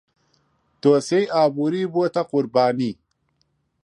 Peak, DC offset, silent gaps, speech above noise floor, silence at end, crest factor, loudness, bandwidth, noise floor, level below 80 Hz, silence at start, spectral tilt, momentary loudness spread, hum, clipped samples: -4 dBFS; under 0.1%; none; 49 dB; 0.9 s; 18 dB; -21 LUFS; 11 kHz; -69 dBFS; -68 dBFS; 0.85 s; -6 dB/octave; 7 LU; none; under 0.1%